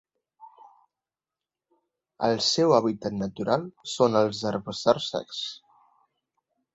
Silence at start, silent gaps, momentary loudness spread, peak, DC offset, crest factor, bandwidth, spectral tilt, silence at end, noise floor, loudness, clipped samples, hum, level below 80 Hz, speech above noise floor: 0.4 s; none; 12 LU; -6 dBFS; under 0.1%; 22 dB; 8.2 kHz; -4.5 dB/octave; 1.15 s; under -90 dBFS; -26 LUFS; under 0.1%; none; -64 dBFS; over 65 dB